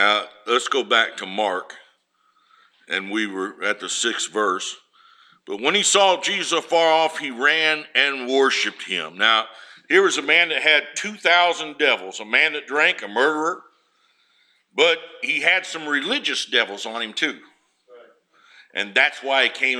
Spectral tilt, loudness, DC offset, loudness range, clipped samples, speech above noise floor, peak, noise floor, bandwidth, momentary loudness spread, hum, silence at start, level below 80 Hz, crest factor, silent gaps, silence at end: -1 dB/octave; -19 LUFS; under 0.1%; 7 LU; under 0.1%; 43 dB; -2 dBFS; -64 dBFS; 14.5 kHz; 11 LU; none; 0 s; -84 dBFS; 20 dB; none; 0 s